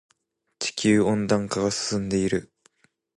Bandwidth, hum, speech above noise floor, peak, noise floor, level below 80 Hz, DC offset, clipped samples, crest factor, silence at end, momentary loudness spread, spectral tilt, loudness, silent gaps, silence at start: 11.5 kHz; none; 50 dB; -8 dBFS; -73 dBFS; -54 dBFS; under 0.1%; under 0.1%; 18 dB; 0.8 s; 9 LU; -4.5 dB/octave; -24 LUFS; none; 0.6 s